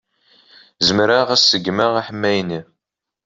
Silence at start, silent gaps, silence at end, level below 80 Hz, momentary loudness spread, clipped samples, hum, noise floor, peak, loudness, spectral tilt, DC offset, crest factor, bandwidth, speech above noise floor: 0.8 s; none; 0.65 s; -56 dBFS; 9 LU; under 0.1%; none; -82 dBFS; -2 dBFS; -16 LUFS; -3.5 dB/octave; under 0.1%; 18 dB; 7.8 kHz; 65 dB